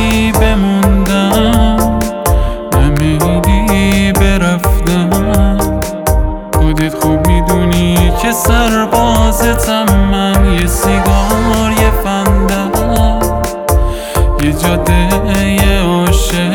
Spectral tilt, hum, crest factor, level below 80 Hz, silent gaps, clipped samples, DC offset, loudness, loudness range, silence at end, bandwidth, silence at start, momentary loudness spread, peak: -5.5 dB/octave; none; 10 dB; -14 dBFS; none; under 0.1%; under 0.1%; -11 LUFS; 2 LU; 0 s; 19.5 kHz; 0 s; 4 LU; 0 dBFS